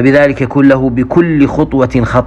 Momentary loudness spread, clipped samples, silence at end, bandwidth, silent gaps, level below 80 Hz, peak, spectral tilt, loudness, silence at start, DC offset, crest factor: 3 LU; 0.7%; 0 s; 8.2 kHz; none; -30 dBFS; 0 dBFS; -8.5 dB/octave; -10 LUFS; 0 s; under 0.1%; 10 dB